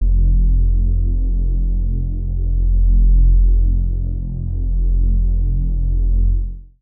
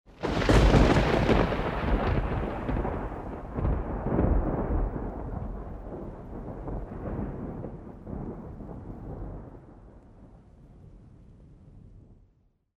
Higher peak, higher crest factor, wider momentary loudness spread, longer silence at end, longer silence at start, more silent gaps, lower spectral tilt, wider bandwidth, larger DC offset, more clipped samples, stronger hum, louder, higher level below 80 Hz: about the same, -6 dBFS vs -6 dBFS; second, 8 dB vs 22 dB; second, 8 LU vs 19 LU; second, 0.15 s vs 0.65 s; about the same, 0 s vs 0.1 s; neither; first, -19 dB/octave vs -7 dB/octave; second, 0.7 kHz vs 10.5 kHz; neither; neither; neither; first, -19 LUFS vs -29 LUFS; first, -14 dBFS vs -34 dBFS